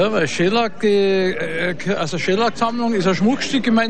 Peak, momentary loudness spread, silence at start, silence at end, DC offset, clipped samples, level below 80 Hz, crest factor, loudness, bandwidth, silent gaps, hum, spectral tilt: -6 dBFS; 5 LU; 0 s; 0 s; 3%; under 0.1%; -52 dBFS; 12 dB; -18 LUFS; 10.5 kHz; none; none; -5 dB/octave